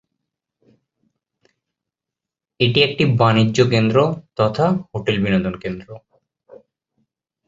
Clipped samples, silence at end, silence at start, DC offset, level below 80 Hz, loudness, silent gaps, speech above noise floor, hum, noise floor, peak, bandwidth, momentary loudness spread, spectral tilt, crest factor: under 0.1%; 1.5 s; 2.6 s; under 0.1%; -50 dBFS; -18 LUFS; none; 69 dB; none; -86 dBFS; -2 dBFS; 7.8 kHz; 9 LU; -6.5 dB/octave; 20 dB